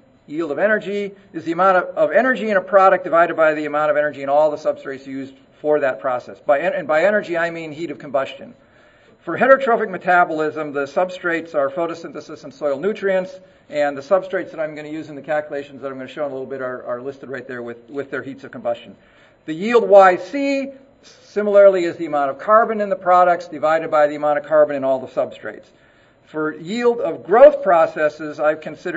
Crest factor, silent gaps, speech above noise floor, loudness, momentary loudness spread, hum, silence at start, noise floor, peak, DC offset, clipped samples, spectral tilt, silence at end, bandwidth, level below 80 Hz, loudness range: 18 dB; none; 32 dB; -18 LUFS; 17 LU; none; 0.3 s; -51 dBFS; 0 dBFS; under 0.1%; under 0.1%; -6 dB/octave; 0 s; 8 kHz; -64 dBFS; 9 LU